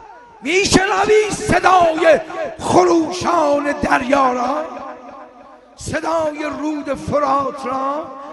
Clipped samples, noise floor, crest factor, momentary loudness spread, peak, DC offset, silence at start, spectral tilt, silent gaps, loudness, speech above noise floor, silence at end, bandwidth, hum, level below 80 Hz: under 0.1%; -43 dBFS; 16 dB; 13 LU; 0 dBFS; under 0.1%; 0 s; -4 dB/octave; none; -16 LUFS; 26 dB; 0 s; 11.5 kHz; none; -42 dBFS